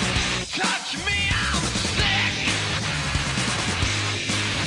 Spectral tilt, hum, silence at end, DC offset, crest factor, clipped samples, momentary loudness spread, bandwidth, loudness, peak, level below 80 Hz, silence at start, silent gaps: -3 dB/octave; none; 0 s; under 0.1%; 14 dB; under 0.1%; 4 LU; 11.5 kHz; -22 LUFS; -10 dBFS; -36 dBFS; 0 s; none